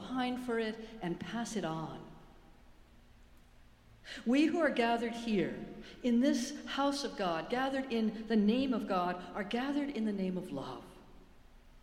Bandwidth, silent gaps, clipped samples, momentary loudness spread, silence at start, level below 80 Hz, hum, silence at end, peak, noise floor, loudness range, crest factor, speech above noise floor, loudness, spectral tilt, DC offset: 14 kHz; none; under 0.1%; 12 LU; 0 s; -60 dBFS; none; 0.05 s; -18 dBFS; -60 dBFS; 8 LU; 18 dB; 26 dB; -34 LUFS; -5.5 dB/octave; under 0.1%